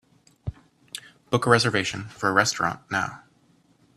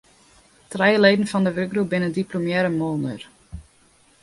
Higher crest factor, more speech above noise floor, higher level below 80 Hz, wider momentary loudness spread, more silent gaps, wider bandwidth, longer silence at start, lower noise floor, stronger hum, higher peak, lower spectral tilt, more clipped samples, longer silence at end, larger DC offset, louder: about the same, 24 dB vs 20 dB; about the same, 38 dB vs 36 dB; about the same, -54 dBFS vs -52 dBFS; second, 20 LU vs 24 LU; neither; first, 14 kHz vs 11.5 kHz; second, 0.45 s vs 0.7 s; first, -61 dBFS vs -57 dBFS; neither; about the same, -2 dBFS vs -2 dBFS; second, -4 dB/octave vs -6 dB/octave; neither; first, 0.8 s vs 0.6 s; neither; about the same, -23 LUFS vs -21 LUFS